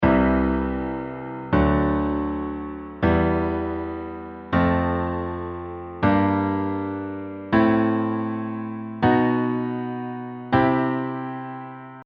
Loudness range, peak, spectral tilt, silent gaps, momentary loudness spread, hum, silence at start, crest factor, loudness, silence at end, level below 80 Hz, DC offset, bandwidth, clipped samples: 1 LU; -4 dBFS; -6.5 dB/octave; none; 13 LU; none; 0 s; 18 dB; -23 LUFS; 0 s; -38 dBFS; under 0.1%; 5.2 kHz; under 0.1%